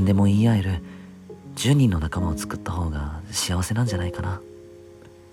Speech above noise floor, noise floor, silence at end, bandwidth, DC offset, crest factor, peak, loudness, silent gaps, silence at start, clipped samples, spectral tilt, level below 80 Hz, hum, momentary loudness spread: 24 dB; -46 dBFS; 0.4 s; 16 kHz; under 0.1%; 16 dB; -8 dBFS; -23 LUFS; none; 0 s; under 0.1%; -6 dB/octave; -38 dBFS; none; 21 LU